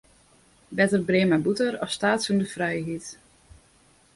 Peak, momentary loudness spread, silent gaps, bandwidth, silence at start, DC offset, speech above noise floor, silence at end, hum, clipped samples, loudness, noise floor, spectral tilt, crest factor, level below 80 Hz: -8 dBFS; 13 LU; none; 11.5 kHz; 0.7 s; under 0.1%; 35 dB; 1 s; none; under 0.1%; -24 LUFS; -59 dBFS; -5 dB/octave; 18 dB; -60 dBFS